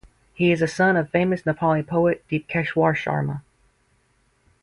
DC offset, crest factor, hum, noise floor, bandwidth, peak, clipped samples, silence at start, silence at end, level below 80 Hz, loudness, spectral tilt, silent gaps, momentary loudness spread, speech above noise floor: under 0.1%; 18 dB; none; -64 dBFS; 11 kHz; -4 dBFS; under 0.1%; 0.4 s; 1.25 s; -54 dBFS; -22 LUFS; -7 dB/octave; none; 7 LU; 43 dB